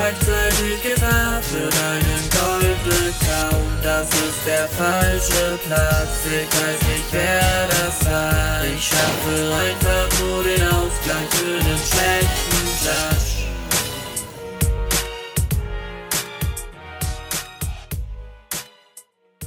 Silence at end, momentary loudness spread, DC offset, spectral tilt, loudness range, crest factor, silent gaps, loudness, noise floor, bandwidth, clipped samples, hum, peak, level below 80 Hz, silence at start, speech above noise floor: 0 s; 11 LU; under 0.1%; -3.5 dB/octave; 6 LU; 18 dB; none; -19 LUFS; -48 dBFS; 19 kHz; under 0.1%; none; -2 dBFS; -28 dBFS; 0 s; 30 dB